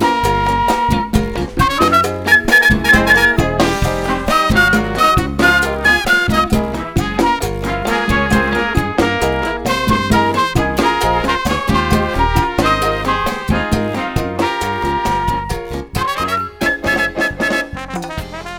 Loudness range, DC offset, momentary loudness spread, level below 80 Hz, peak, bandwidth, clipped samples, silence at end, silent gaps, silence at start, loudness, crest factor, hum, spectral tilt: 6 LU; under 0.1%; 8 LU; -26 dBFS; 0 dBFS; 19.5 kHz; under 0.1%; 0 s; none; 0 s; -15 LUFS; 14 dB; none; -5 dB/octave